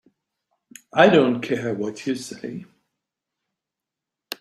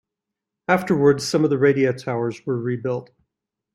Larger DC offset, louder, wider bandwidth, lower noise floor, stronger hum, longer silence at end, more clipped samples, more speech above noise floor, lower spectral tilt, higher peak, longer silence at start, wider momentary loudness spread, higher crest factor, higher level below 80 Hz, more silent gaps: neither; about the same, -20 LUFS vs -21 LUFS; first, 16 kHz vs 13.5 kHz; about the same, -86 dBFS vs -84 dBFS; neither; second, 0.05 s vs 0.7 s; neither; about the same, 66 dB vs 65 dB; about the same, -5.5 dB/octave vs -6 dB/octave; about the same, -2 dBFS vs -2 dBFS; first, 0.95 s vs 0.7 s; first, 20 LU vs 9 LU; about the same, 22 dB vs 20 dB; second, -66 dBFS vs -60 dBFS; neither